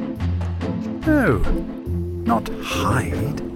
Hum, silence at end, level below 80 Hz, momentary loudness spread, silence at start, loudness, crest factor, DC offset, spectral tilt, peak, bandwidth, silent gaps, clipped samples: none; 0 s; -30 dBFS; 8 LU; 0 s; -22 LUFS; 14 dB; under 0.1%; -6.5 dB/octave; -6 dBFS; 16.5 kHz; none; under 0.1%